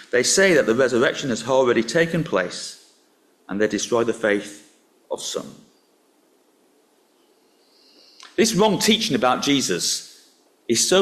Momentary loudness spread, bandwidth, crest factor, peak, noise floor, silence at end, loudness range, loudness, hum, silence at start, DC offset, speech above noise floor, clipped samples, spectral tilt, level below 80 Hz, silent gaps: 15 LU; 15 kHz; 18 dB; -4 dBFS; -60 dBFS; 0 s; 16 LU; -20 LUFS; none; 0 s; under 0.1%; 41 dB; under 0.1%; -3 dB/octave; -60 dBFS; none